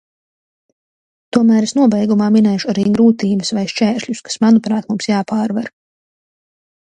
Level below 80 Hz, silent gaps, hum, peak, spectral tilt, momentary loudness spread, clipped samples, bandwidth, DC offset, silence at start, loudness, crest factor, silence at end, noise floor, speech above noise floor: -58 dBFS; none; none; 0 dBFS; -5.5 dB/octave; 7 LU; under 0.1%; 9.4 kHz; under 0.1%; 1.35 s; -15 LUFS; 16 dB; 1.15 s; under -90 dBFS; over 76 dB